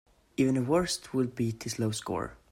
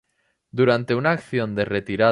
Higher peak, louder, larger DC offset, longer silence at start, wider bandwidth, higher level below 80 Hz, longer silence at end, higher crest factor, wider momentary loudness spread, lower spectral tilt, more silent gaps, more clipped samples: second, -14 dBFS vs -4 dBFS; second, -30 LUFS vs -22 LUFS; neither; second, 0.4 s vs 0.55 s; first, 16 kHz vs 11 kHz; about the same, -58 dBFS vs -54 dBFS; first, 0.15 s vs 0 s; about the same, 16 dB vs 16 dB; first, 8 LU vs 5 LU; second, -5.5 dB/octave vs -7.5 dB/octave; neither; neither